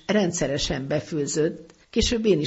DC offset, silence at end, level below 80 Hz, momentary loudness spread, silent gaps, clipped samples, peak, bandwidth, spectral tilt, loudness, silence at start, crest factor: under 0.1%; 0 s; -40 dBFS; 6 LU; none; under 0.1%; -8 dBFS; 8 kHz; -4.5 dB/octave; -25 LUFS; 0.1 s; 16 dB